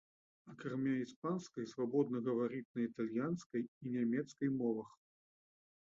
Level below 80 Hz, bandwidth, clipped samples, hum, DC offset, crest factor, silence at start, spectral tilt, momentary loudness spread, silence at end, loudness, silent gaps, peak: -82 dBFS; 7.6 kHz; under 0.1%; none; under 0.1%; 18 dB; 0.45 s; -7.5 dB/octave; 8 LU; 1.1 s; -40 LUFS; 1.16-1.22 s, 2.65-2.74 s, 3.46-3.50 s, 3.68-3.81 s; -22 dBFS